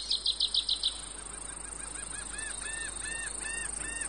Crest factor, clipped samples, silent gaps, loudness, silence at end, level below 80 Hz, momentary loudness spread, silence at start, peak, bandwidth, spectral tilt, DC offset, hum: 18 dB; under 0.1%; none; -33 LUFS; 0 s; -50 dBFS; 12 LU; 0 s; -16 dBFS; 10 kHz; 0.5 dB/octave; 0.1%; none